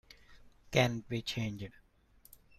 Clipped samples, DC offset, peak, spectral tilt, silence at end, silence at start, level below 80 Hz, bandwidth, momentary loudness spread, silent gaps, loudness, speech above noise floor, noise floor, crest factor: under 0.1%; under 0.1%; -14 dBFS; -5 dB/octave; 0.9 s; 0.3 s; -60 dBFS; 15.5 kHz; 15 LU; none; -34 LUFS; 31 dB; -64 dBFS; 24 dB